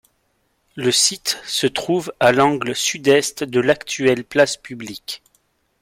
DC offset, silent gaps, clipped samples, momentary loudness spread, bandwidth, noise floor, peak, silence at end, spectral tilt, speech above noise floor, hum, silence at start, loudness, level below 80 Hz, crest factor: under 0.1%; none; under 0.1%; 15 LU; 16.5 kHz; -66 dBFS; -2 dBFS; 0.65 s; -3 dB/octave; 48 dB; none; 0.75 s; -18 LUFS; -58 dBFS; 18 dB